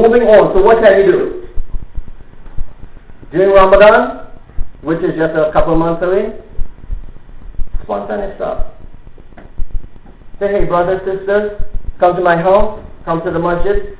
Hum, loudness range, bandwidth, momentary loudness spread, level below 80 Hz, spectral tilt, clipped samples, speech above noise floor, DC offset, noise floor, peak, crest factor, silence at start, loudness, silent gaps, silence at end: none; 13 LU; 4 kHz; 24 LU; -26 dBFS; -10 dB/octave; under 0.1%; 21 dB; under 0.1%; -32 dBFS; 0 dBFS; 12 dB; 0 s; -12 LUFS; none; 0 s